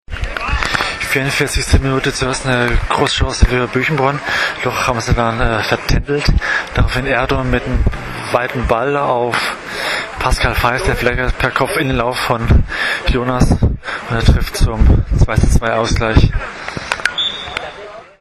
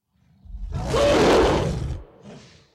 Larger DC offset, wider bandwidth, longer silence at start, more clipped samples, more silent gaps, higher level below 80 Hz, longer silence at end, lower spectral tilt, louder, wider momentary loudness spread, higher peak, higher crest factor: neither; second, 13.5 kHz vs 15.5 kHz; second, 0.1 s vs 0.5 s; neither; neither; first, -20 dBFS vs -34 dBFS; second, 0.15 s vs 0.35 s; about the same, -5 dB/octave vs -5.5 dB/octave; first, -16 LUFS vs -20 LUFS; second, 6 LU vs 19 LU; first, 0 dBFS vs -10 dBFS; about the same, 14 dB vs 14 dB